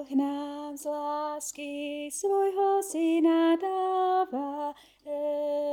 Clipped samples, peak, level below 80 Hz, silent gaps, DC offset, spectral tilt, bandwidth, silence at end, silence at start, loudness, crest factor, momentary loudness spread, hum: under 0.1%; -14 dBFS; -74 dBFS; none; under 0.1%; -2.5 dB/octave; 17 kHz; 0 s; 0 s; -29 LUFS; 14 dB; 12 LU; 50 Hz at -75 dBFS